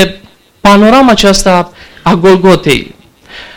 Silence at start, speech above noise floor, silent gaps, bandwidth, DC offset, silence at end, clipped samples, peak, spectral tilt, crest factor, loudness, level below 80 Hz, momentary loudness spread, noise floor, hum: 0 s; 26 dB; none; 20 kHz; under 0.1%; 0.1 s; under 0.1%; 0 dBFS; -5 dB/octave; 8 dB; -7 LUFS; -28 dBFS; 8 LU; -32 dBFS; none